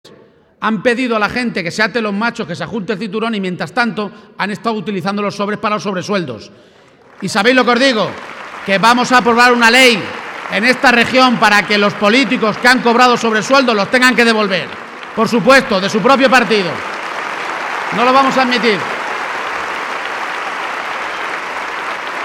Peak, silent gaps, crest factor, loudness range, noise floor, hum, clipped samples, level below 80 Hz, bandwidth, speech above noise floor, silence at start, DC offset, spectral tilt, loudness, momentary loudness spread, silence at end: 0 dBFS; none; 14 dB; 9 LU; -45 dBFS; none; 0.1%; -52 dBFS; 19.5 kHz; 33 dB; 0.05 s; under 0.1%; -4 dB/octave; -13 LUFS; 12 LU; 0 s